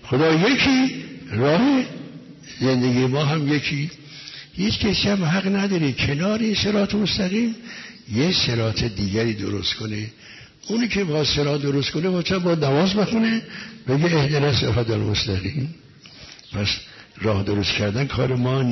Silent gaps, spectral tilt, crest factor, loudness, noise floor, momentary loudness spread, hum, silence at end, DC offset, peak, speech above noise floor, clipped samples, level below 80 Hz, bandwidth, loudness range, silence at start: none; -5.5 dB/octave; 14 dB; -21 LUFS; -44 dBFS; 15 LU; none; 0 s; under 0.1%; -8 dBFS; 23 dB; under 0.1%; -44 dBFS; 6.2 kHz; 3 LU; 0 s